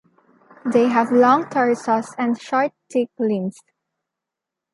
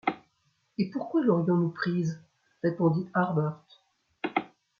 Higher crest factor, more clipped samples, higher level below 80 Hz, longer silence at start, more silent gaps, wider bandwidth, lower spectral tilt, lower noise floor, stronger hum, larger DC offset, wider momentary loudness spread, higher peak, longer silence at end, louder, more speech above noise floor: about the same, 18 dB vs 20 dB; neither; about the same, -74 dBFS vs -72 dBFS; first, 0.65 s vs 0.05 s; neither; first, 11.5 kHz vs 7 kHz; second, -6 dB/octave vs -8.5 dB/octave; first, -85 dBFS vs -72 dBFS; neither; neither; second, 9 LU vs 14 LU; first, -4 dBFS vs -10 dBFS; first, 1.2 s vs 0.35 s; first, -19 LUFS vs -29 LUFS; first, 66 dB vs 45 dB